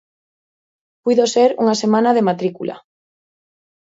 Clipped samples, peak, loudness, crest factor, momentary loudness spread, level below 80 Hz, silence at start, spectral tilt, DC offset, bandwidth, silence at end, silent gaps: under 0.1%; -2 dBFS; -16 LUFS; 18 dB; 11 LU; -68 dBFS; 1.05 s; -5 dB/octave; under 0.1%; 8 kHz; 1.1 s; none